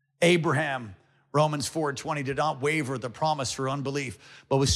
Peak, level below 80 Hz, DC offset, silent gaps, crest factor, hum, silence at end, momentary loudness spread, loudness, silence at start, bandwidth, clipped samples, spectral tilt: -10 dBFS; -56 dBFS; under 0.1%; none; 18 dB; none; 0 s; 10 LU; -27 LUFS; 0.2 s; 14.5 kHz; under 0.1%; -4.5 dB/octave